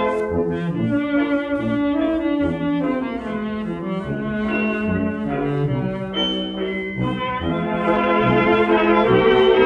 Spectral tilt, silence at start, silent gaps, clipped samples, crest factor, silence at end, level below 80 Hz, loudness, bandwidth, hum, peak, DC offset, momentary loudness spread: -8 dB/octave; 0 s; none; under 0.1%; 16 dB; 0 s; -44 dBFS; -20 LUFS; 8.6 kHz; none; -4 dBFS; under 0.1%; 9 LU